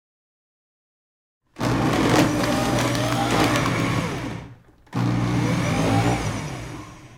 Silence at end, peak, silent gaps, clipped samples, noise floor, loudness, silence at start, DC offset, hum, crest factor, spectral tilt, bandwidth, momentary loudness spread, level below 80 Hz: 0 s; -4 dBFS; none; under 0.1%; -45 dBFS; -22 LUFS; 1.55 s; under 0.1%; none; 18 dB; -5.5 dB/octave; 17 kHz; 13 LU; -42 dBFS